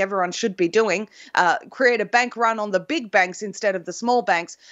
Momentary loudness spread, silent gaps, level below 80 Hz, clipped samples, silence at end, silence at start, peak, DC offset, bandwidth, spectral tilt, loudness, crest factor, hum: 5 LU; none; -78 dBFS; under 0.1%; 0.15 s; 0 s; -2 dBFS; under 0.1%; 8.2 kHz; -3.5 dB/octave; -21 LUFS; 18 dB; none